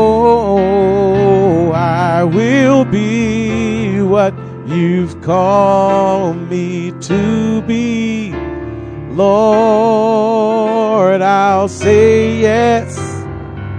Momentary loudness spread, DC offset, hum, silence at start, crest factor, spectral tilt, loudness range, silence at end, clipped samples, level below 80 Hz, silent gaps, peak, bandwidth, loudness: 12 LU; under 0.1%; none; 0 s; 12 dB; -7 dB/octave; 4 LU; 0 s; under 0.1%; -38 dBFS; none; 0 dBFS; 10 kHz; -12 LUFS